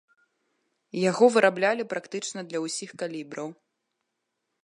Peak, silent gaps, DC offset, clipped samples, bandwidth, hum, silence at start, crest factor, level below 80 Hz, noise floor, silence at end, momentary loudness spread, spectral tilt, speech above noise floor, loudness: -6 dBFS; none; under 0.1%; under 0.1%; 11 kHz; none; 0.95 s; 22 dB; -80 dBFS; -81 dBFS; 1.1 s; 17 LU; -4 dB/octave; 55 dB; -26 LUFS